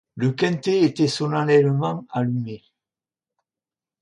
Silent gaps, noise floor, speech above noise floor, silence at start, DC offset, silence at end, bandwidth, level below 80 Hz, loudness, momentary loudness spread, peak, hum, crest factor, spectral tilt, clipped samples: none; under -90 dBFS; over 69 dB; 0.15 s; under 0.1%; 1.45 s; 11 kHz; -66 dBFS; -21 LUFS; 10 LU; -4 dBFS; none; 18 dB; -6.5 dB/octave; under 0.1%